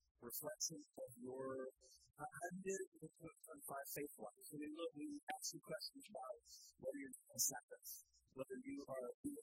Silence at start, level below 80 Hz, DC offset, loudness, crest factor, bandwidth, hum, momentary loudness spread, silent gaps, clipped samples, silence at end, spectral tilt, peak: 0.2 s; -86 dBFS; under 0.1%; -50 LUFS; 26 dB; 16 kHz; none; 12 LU; 2.87-2.92 s, 5.23-5.27 s, 7.63-7.68 s, 9.14-9.24 s; under 0.1%; 0 s; -2.5 dB/octave; -26 dBFS